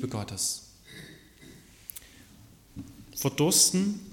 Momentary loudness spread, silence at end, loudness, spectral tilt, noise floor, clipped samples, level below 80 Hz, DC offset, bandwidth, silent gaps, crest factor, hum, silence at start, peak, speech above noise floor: 26 LU; 0 s; -25 LUFS; -3 dB/octave; -54 dBFS; under 0.1%; -60 dBFS; under 0.1%; 17.5 kHz; none; 24 dB; none; 0 s; -8 dBFS; 27 dB